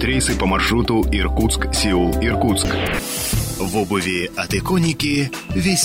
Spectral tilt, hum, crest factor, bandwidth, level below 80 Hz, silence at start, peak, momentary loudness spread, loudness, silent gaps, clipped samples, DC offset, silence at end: -4 dB/octave; none; 14 dB; 16.5 kHz; -26 dBFS; 0 s; -6 dBFS; 4 LU; -19 LUFS; none; under 0.1%; under 0.1%; 0 s